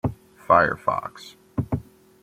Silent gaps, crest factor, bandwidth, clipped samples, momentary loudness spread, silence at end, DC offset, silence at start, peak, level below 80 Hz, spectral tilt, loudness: none; 22 dB; 16 kHz; under 0.1%; 16 LU; 0.4 s; under 0.1%; 0.05 s; -2 dBFS; -48 dBFS; -7 dB/octave; -23 LUFS